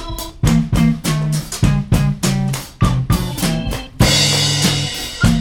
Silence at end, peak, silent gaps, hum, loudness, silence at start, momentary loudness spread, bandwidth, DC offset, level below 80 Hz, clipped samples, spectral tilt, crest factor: 0 s; 0 dBFS; none; none; -16 LUFS; 0 s; 8 LU; 19 kHz; under 0.1%; -26 dBFS; under 0.1%; -4.5 dB/octave; 16 dB